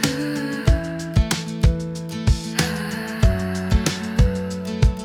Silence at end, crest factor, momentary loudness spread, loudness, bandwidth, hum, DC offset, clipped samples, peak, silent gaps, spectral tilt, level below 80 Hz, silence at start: 0 s; 18 dB; 6 LU; -22 LUFS; 17.5 kHz; none; under 0.1%; under 0.1%; -2 dBFS; none; -5.5 dB/octave; -24 dBFS; 0 s